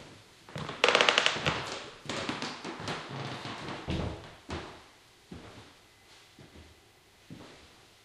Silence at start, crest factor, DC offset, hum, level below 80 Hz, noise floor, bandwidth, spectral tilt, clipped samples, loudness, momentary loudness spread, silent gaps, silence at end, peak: 0 s; 34 dB; under 0.1%; none; -54 dBFS; -60 dBFS; 14.5 kHz; -3 dB/octave; under 0.1%; -31 LUFS; 28 LU; none; 0.35 s; -2 dBFS